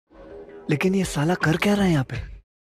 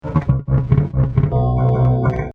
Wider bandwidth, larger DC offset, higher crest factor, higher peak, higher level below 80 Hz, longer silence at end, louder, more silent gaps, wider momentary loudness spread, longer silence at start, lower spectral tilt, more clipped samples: first, 15 kHz vs 3.6 kHz; neither; about the same, 14 dB vs 14 dB; second, -8 dBFS vs -2 dBFS; second, -44 dBFS vs -28 dBFS; first, 0.3 s vs 0.05 s; second, -22 LUFS vs -17 LUFS; neither; first, 21 LU vs 3 LU; first, 0.2 s vs 0.05 s; second, -6 dB/octave vs -11.5 dB/octave; neither